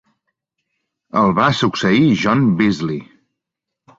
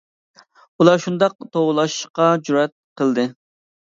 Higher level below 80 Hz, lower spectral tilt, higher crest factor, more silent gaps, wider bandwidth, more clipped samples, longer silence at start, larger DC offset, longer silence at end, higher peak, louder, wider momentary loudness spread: first, -50 dBFS vs -70 dBFS; about the same, -6.5 dB/octave vs -5.5 dB/octave; about the same, 16 dB vs 18 dB; second, none vs 1.35-1.39 s, 2.10-2.14 s, 2.72-2.96 s; about the same, 7.8 kHz vs 7.8 kHz; neither; first, 1.15 s vs 0.8 s; neither; first, 0.95 s vs 0.65 s; about the same, -2 dBFS vs 0 dBFS; first, -16 LUFS vs -19 LUFS; about the same, 9 LU vs 8 LU